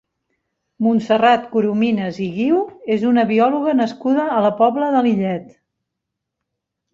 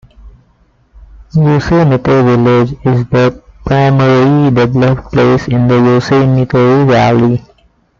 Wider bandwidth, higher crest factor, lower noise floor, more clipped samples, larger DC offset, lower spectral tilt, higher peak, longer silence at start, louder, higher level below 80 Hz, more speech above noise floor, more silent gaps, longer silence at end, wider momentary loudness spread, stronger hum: about the same, 7.4 kHz vs 7.2 kHz; first, 16 dB vs 10 dB; first, -80 dBFS vs -51 dBFS; neither; neither; about the same, -7.5 dB/octave vs -8.5 dB/octave; about the same, -2 dBFS vs 0 dBFS; first, 0.8 s vs 0.25 s; second, -17 LUFS vs -10 LUFS; second, -62 dBFS vs -34 dBFS; first, 63 dB vs 42 dB; neither; first, 1.45 s vs 0.6 s; about the same, 7 LU vs 5 LU; neither